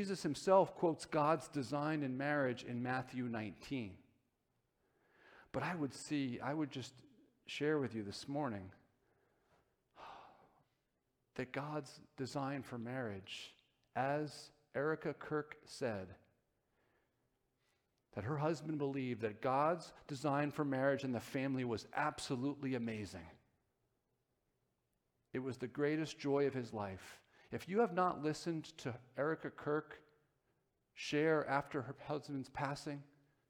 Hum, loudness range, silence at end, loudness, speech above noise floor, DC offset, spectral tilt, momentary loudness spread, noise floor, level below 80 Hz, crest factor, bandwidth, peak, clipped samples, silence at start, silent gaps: none; 8 LU; 0.45 s; -40 LUFS; 45 dB; under 0.1%; -6 dB/octave; 14 LU; -85 dBFS; -76 dBFS; 24 dB; 17 kHz; -18 dBFS; under 0.1%; 0 s; none